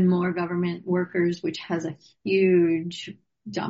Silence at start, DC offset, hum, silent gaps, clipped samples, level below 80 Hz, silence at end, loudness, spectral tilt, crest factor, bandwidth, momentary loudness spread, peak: 0 s; under 0.1%; none; none; under 0.1%; -68 dBFS; 0 s; -25 LUFS; -6 dB/octave; 14 dB; 7.8 kHz; 16 LU; -10 dBFS